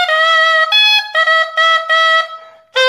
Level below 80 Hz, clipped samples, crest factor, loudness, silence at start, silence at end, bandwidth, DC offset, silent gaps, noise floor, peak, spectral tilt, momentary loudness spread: -78 dBFS; under 0.1%; 12 dB; -10 LUFS; 0 s; 0 s; 16 kHz; under 0.1%; none; -33 dBFS; 0 dBFS; 4.5 dB/octave; 5 LU